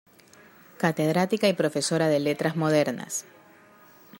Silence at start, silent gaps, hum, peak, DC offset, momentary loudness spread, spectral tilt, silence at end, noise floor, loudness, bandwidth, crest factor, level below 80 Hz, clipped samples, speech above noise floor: 0.8 s; none; none; -8 dBFS; under 0.1%; 6 LU; -5 dB/octave; 0 s; -54 dBFS; -25 LUFS; 16 kHz; 18 dB; -70 dBFS; under 0.1%; 29 dB